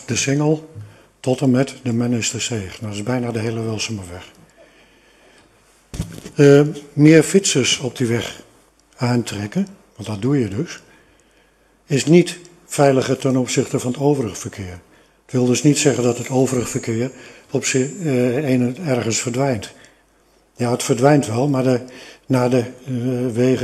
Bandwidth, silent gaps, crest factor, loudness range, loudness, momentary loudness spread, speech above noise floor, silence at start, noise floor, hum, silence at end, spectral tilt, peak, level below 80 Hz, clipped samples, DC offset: 13 kHz; none; 18 dB; 8 LU; -18 LUFS; 16 LU; 39 dB; 0 s; -56 dBFS; none; 0 s; -5 dB/octave; 0 dBFS; -52 dBFS; under 0.1%; under 0.1%